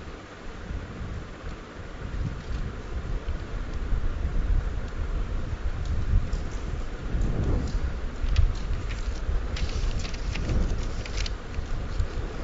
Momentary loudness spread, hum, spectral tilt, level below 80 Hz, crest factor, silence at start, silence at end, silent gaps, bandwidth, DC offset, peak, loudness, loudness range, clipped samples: 9 LU; none; -6 dB/octave; -28 dBFS; 18 dB; 0 s; 0 s; none; 7.8 kHz; under 0.1%; -10 dBFS; -32 LUFS; 5 LU; under 0.1%